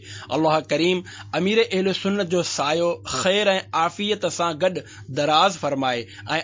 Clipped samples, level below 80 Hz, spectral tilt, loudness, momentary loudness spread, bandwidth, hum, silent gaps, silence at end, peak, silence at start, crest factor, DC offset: under 0.1%; -58 dBFS; -4 dB/octave; -22 LUFS; 8 LU; 7.8 kHz; none; none; 0 s; -4 dBFS; 0 s; 18 dB; under 0.1%